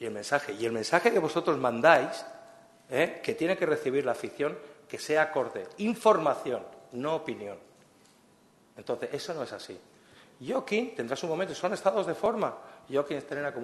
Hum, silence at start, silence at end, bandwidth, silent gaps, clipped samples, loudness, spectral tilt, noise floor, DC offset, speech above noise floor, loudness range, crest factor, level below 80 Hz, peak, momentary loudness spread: none; 0 s; 0 s; 12.5 kHz; none; under 0.1%; -29 LUFS; -4.5 dB/octave; -62 dBFS; under 0.1%; 33 dB; 10 LU; 24 dB; -74 dBFS; -6 dBFS; 17 LU